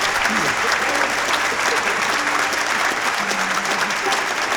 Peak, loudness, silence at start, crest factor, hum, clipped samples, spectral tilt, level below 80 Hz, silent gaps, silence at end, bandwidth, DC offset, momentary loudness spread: -4 dBFS; -18 LUFS; 0 s; 16 dB; none; under 0.1%; -1 dB/octave; -52 dBFS; none; 0 s; over 20 kHz; under 0.1%; 2 LU